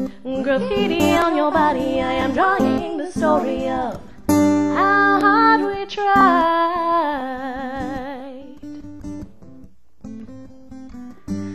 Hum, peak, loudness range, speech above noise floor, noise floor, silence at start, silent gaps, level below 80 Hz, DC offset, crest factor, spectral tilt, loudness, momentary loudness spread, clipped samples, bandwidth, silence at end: none; -2 dBFS; 17 LU; 30 dB; -47 dBFS; 0 s; none; -46 dBFS; 0.8%; 18 dB; -5.5 dB/octave; -18 LUFS; 22 LU; under 0.1%; 13 kHz; 0 s